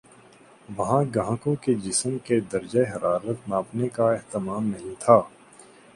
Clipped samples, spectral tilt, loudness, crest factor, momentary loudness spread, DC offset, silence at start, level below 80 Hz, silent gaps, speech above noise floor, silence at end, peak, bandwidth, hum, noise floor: under 0.1%; -6 dB/octave; -25 LUFS; 24 dB; 10 LU; under 0.1%; 0.7 s; -58 dBFS; none; 28 dB; 0.35 s; -2 dBFS; 11.5 kHz; none; -52 dBFS